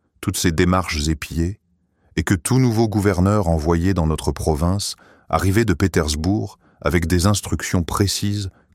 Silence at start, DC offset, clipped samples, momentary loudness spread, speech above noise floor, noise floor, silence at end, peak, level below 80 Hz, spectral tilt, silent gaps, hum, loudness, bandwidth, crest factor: 0.2 s; under 0.1%; under 0.1%; 8 LU; 43 dB; -62 dBFS; 0.25 s; -2 dBFS; -32 dBFS; -5.5 dB/octave; none; none; -20 LUFS; 16 kHz; 18 dB